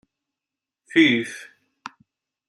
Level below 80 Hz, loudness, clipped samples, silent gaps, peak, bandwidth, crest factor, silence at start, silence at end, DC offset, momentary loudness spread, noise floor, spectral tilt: -72 dBFS; -19 LUFS; under 0.1%; none; -4 dBFS; 11.5 kHz; 22 dB; 0.95 s; 1.05 s; under 0.1%; 25 LU; -88 dBFS; -4.5 dB/octave